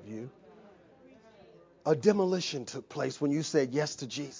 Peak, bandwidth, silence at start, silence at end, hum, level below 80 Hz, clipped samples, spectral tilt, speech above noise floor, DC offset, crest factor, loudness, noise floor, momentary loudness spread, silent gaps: -10 dBFS; 7.6 kHz; 0 s; 0 s; none; -74 dBFS; under 0.1%; -5 dB/octave; 27 dB; under 0.1%; 22 dB; -31 LUFS; -58 dBFS; 15 LU; none